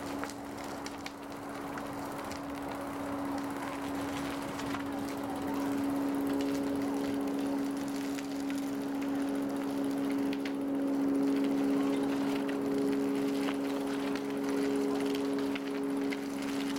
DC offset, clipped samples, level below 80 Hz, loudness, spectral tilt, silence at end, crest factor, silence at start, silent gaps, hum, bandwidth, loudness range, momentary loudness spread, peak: under 0.1%; under 0.1%; -64 dBFS; -34 LUFS; -5 dB/octave; 0 s; 14 dB; 0 s; none; none; 17 kHz; 6 LU; 9 LU; -20 dBFS